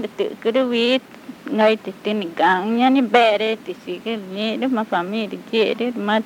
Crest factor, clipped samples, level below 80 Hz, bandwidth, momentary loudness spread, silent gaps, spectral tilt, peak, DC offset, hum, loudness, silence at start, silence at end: 20 dB; under 0.1%; -72 dBFS; 17 kHz; 12 LU; none; -5.5 dB/octave; 0 dBFS; under 0.1%; none; -20 LUFS; 0 s; 0 s